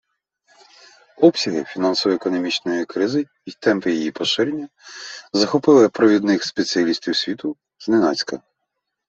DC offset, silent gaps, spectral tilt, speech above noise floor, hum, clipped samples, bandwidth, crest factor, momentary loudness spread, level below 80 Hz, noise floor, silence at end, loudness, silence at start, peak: under 0.1%; none; -4.5 dB/octave; 59 dB; none; under 0.1%; 7.8 kHz; 18 dB; 16 LU; -66 dBFS; -78 dBFS; 0.7 s; -19 LUFS; 1.2 s; -2 dBFS